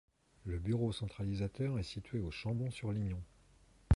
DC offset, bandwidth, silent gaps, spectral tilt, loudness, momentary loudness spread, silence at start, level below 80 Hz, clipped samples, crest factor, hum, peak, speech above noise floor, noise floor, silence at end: under 0.1%; 11.5 kHz; none; -7.5 dB/octave; -39 LUFS; 8 LU; 0.45 s; -50 dBFS; under 0.1%; 22 dB; none; -16 dBFS; 27 dB; -65 dBFS; 0 s